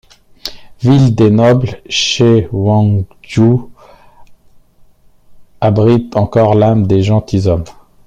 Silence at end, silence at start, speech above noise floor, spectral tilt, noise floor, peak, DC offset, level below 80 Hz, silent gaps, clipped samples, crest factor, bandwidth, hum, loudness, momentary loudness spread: 0.35 s; 0.45 s; 34 dB; -6.5 dB/octave; -44 dBFS; 0 dBFS; under 0.1%; -40 dBFS; none; under 0.1%; 12 dB; 8.6 kHz; none; -11 LUFS; 10 LU